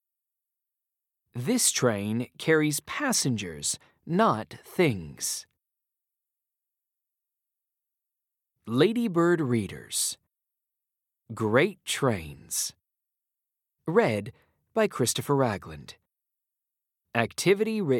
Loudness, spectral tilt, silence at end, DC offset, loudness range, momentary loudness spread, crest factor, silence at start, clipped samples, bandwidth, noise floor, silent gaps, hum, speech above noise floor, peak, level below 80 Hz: -27 LUFS; -4 dB/octave; 0 s; under 0.1%; 5 LU; 11 LU; 24 dB; 1.35 s; under 0.1%; 18 kHz; -87 dBFS; none; none; 61 dB; -6 dBFS; -66 dBFS